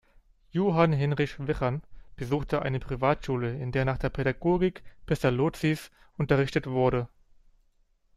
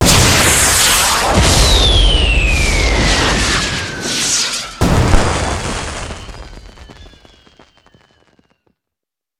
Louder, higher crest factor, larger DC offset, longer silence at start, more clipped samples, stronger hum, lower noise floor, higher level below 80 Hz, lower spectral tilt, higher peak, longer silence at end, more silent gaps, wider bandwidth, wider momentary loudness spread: second, -28 LUFS vs -12 LUFS; first, 20 dB vs 14 dB; neither; first, 0.55 s vs 0 s; neither; neither; second, -66 dBFS vs -84 dBFS; second, -46 dBFS vs -20 dBFS; first, -7.5 dB/octave vs -2.5 dB/octave; second, -8 dBFS vs 0 dBFS; second, 1.1 s vs 2.35 s; neither; second, 14 kHz vs 18 kHz; second, 9 LU vs 12 LU